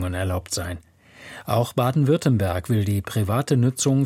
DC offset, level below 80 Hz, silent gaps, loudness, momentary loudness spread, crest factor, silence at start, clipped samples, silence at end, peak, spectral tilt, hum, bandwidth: under 0.1%; -48 dBFS; none; -22 LUFS; 12 LU; 16 dB; 0 s; under 0.1%; 0 s; -6 dBFS; -6 dB/octave; none; 16.5 kHz